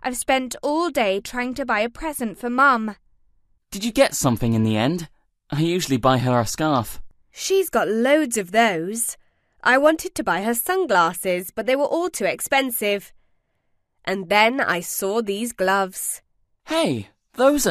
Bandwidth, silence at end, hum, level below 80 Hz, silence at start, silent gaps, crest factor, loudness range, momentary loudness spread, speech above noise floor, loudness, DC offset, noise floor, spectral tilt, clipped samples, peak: 14 kHz; 0 s; none; -48 dBFS; 0.05 s; none; 20 dB; 2 LU; 10 LU; 48 dB; -21 LUFS; under 0.1%; -69 dBFS; -4 dB/octave; under 0.1%; -2 dBFS